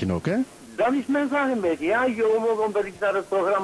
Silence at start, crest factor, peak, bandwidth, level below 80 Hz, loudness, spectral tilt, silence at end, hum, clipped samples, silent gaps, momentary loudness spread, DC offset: 0 s; 12 dB; -12 dBFS; 11 kHz; -58 dBFS; -24 LUFS; -6.5 dB/octave; 0 s; none; under 0.1%; none; 4 LU; under 0.1%